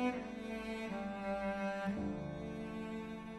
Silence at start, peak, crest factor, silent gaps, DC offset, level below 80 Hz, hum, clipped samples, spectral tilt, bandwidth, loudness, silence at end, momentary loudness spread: 0 s; -24 dBFS; 16 dB; none; under 0.1%; -60 dBFS; none; under 0.1%; -6.5 dB/octave; 12.5 kHz; -42 LUFS; 0 s; 5 LU